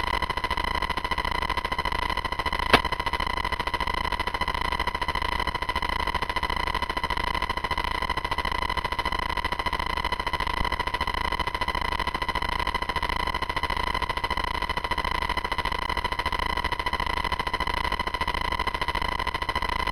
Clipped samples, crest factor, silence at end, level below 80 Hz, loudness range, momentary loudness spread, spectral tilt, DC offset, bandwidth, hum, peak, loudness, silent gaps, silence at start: under 0.1%; 24 dB; 0 s; -36 dBFS; 1 LU; 1 LU; -4 dB/octave; under 0.1%; 17 kHz; none; -4 dBFS; -27 LUFS; none; 0 s